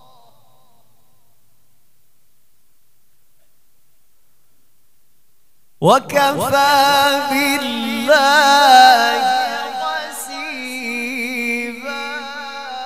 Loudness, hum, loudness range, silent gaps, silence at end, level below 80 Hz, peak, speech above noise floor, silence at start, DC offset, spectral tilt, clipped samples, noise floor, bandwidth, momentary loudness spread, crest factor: -15 LUFS; none; 10 LU; none; 0 s; -66 dBFS; 0 dBFS; 50 dB; 5.8 s; 0.6%; -2.5 dB/octave; under 0.1%; -63 dBFS; 16 kHz; 16 LU; 18 dB